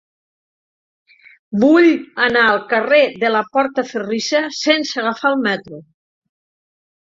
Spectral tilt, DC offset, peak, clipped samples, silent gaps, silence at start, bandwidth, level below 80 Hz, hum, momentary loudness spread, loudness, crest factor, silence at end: -4 dB/octave; under 0.1%; -2 dBFS; under 0.1%; none; 1.5 s; 7.8 kHz; -62 dBFS; none; 9 LU; -16 LUFS; 16 dB; 1.35 s